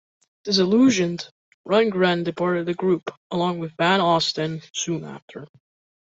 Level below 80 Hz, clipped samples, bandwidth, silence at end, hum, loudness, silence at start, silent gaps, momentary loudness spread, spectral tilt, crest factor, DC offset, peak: -64 dBFS; under 0.1%; 8 kHz; 0.55 s; none; -22 LUFS; 0.45 s; 1.31-1.64 s, 3.17-3.30 s, 5.22-5.28 s; 18 LU; -4.5 dB/octave; 16 dB; under 0.1%; -6 dBFS